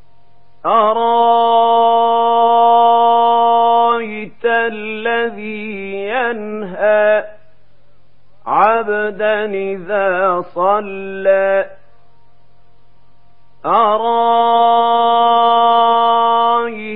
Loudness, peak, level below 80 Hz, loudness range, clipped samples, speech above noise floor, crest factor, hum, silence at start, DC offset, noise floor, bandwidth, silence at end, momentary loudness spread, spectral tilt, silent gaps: -13 LUFS; 0 dBFS; -62 dBFS; 7 LU; under 0.1%; 40 dB; 14 dB; none; 0.65 s; 2%; -55 dBFS; 4.1 kHz; 0 s; 11 LU; -9.5 dB/octave; none